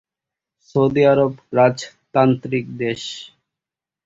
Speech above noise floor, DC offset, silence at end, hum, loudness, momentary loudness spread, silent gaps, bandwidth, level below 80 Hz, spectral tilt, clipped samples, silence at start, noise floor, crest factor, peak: 70 dB; under 0.1%; 0.8 s; none; -18 LUFS; 14 LU; none; 7.8 kHz; -56 dBFS; -6.5 dB/octave; under 0.1%; 0.75 s; -88 dBFS; 18 dB; -2 dBFS